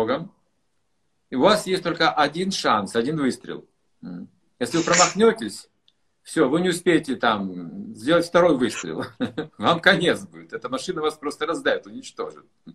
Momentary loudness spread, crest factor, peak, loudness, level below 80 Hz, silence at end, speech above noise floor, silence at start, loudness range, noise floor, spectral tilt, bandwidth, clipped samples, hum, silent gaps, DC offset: 18 LU; 22 dB; 0 dBFS; -22 LUFS; -60 dBFS; 0.05 s; 52 dB; 0 s; 2 LU; -74 dBFS; -4 dB/octave; 13 kHz; under 0.1%; none; none; under 0.1%